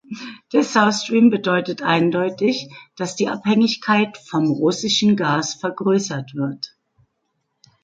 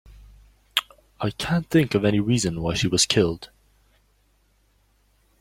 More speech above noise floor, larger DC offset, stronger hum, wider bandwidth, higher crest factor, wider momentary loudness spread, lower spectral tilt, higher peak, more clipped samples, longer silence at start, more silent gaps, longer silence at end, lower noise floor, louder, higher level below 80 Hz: first, 54 dB vs 41 dB; neither; neither; second, 9 kHz vs 16.5 kHz; second, 18 dB vs 24 dB; about the same, 12 LU vs 11 LU; about the same, -4.5 dB/octave vs -4.5 dB/octave; about the same, -2 dBFS vs -2 dBFS; neither; second, 0.1 s vs 0.75 s; neither; second, 1.15 s vs 1.95 s; first, -73 dBFS vs -63 dBFS; first, -19 LUFS vs -22 LUFS; second, -64 dBFS vs -48 dBFS